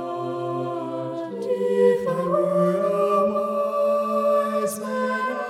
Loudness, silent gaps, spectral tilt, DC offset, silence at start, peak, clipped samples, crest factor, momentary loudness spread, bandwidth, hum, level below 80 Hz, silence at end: -23 LUFS; none; -6.5 dB/octave; under 0.1%; 0 s; -8 dBFS; under 0.1%; 14 dB; 9 LU; 15 kHz; none; -70 dBFS; 0 s